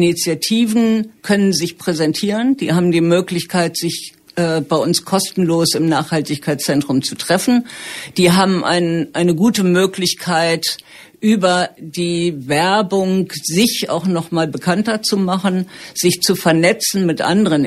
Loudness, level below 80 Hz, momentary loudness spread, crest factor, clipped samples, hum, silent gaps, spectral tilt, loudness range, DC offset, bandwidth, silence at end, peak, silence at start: -16 LUFS; -56 dBFS; 6 LU; 14 dB; under 0.1%; none; none; -4.5 dB/octave; 2 LU; under 0.1%; 14.5 kHz; 0 s; -2 dBFS; 0 s